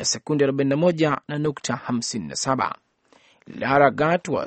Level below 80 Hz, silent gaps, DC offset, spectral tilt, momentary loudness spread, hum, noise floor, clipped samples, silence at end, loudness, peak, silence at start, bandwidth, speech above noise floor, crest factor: -58 dBFS; none; under 0.1%; -4.5 dB/octave; 10 LU; none; -58 dBFS; under 0.1%; 0 s; -22 LUFS; -2 dBFS; 0 s; 8.8 kHz; 36 dB; 20 dB